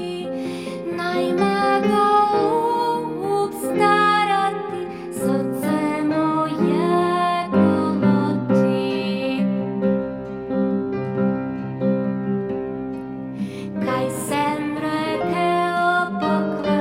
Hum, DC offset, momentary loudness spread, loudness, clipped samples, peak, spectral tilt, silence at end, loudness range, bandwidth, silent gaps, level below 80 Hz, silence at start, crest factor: none; under 0.1%; 10 LU; -21 LUFS; under 0.1%; -4 dBFS; -6.5 dB/octave; 0 s; 5 LU; 16 kHz; none; -56 dBFS; 0 s; 16 dB